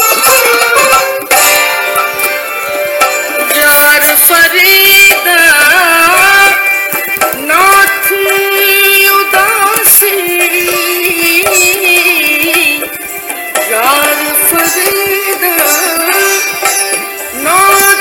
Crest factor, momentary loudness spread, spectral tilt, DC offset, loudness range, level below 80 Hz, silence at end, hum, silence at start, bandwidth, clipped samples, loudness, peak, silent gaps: 8 dB; 8 LU; 0 dB/octave; under 0.1%; 5 LU; -46 dBFS; 0 s; none; 0 s; over 20 kHz; 1%; -6 LUFS; 0 dBFS; none